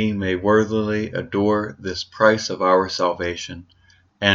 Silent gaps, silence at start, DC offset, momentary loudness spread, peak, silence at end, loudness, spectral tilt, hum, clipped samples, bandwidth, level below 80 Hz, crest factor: none; 0 s; under 0.1%; 11 LU; 0 dBFS; 0 s; -20 LUFS; -5 dB/octave; none; under 0.1%; 7.6 kHz; -54 dBFS; 20 dB